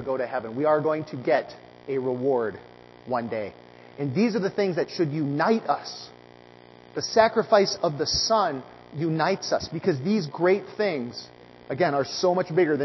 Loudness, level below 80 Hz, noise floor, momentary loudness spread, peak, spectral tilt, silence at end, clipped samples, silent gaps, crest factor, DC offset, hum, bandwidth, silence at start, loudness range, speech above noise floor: -25 LUFS; -58 dBFS; -49 dBFS; 15 LU; -4 dBFS; -5 dB/octave; 0 s; under 0.1%; none; 20 dB; under 0.1%; 60 Hz at -55 dBFS; 6.2 kHz; 0 s; 4 LU; 25 dB